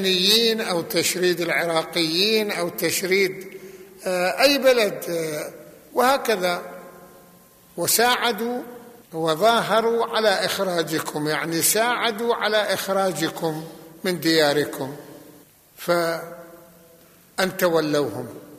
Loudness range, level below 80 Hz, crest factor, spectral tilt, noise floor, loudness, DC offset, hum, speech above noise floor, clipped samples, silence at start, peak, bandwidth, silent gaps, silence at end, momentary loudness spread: 4 LU; -64 dBFS; 18 dB; -3 dB/octave; -52 dBFS; -21 LUFS; under 0.1%; none; 30 dB; under 0.1%; 0 s; -4 dBFS; 15 kHz; none; 0 s; 16 LU